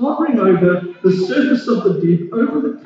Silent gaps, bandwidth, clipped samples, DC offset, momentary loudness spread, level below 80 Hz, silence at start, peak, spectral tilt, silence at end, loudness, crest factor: none; 7.6 kHz; under 0.1%; under 0.1%; 4 LU; -60 dBFS; 0 s; -2 dBFS; -8.5 dB/octave; 0.05 s; -15 LUFS; 14 dB